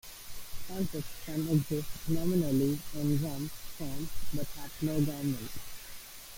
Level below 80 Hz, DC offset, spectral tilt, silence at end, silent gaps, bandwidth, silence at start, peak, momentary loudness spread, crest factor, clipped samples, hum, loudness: -48 dBFS; under 0.1%; -6 dB/octave; 0 s; none; 17 kHz; 0.05 s; -16 dBFS; 15 LU; 16 dB; under 0.1%; none; -34 LUFS